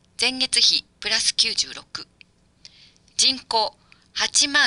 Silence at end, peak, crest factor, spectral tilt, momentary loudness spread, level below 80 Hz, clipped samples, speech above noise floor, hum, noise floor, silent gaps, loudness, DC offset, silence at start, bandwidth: 0 s; -4 dBFS; 20 dB; 1 dB/octave; 16 LU; -60 dBFS; under 0.1%; 34 dB; none; -56 dBFS; none; -20 LUFS; under 0.1%; 0.2 s; 11.5 kHz